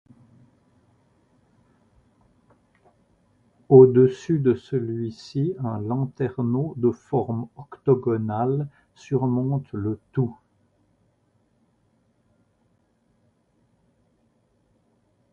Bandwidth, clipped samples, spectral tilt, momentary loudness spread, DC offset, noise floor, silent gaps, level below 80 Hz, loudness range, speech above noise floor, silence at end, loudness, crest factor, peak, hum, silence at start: 7.2 kHz; under 0.1%; -10 dB/octave; 14 LU; under 0.1%; -67 dBFS; none; -60 dBFS; 10 LU; 45 dB; 5 s; -23 LUFS; 24 dB; -2 dBFS; none; 3.7 s